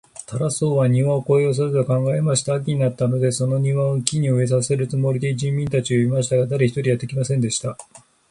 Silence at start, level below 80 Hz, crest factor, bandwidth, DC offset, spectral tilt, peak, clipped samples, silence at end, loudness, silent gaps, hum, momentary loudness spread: 0.2 s; -54 dBFS; 20 dB; 11.5 kHz; under 0.1%; -6 dB/octave; 0 dBFS; under 0.1%; 0.3 s; -20 LUFS; none; none; 5 LU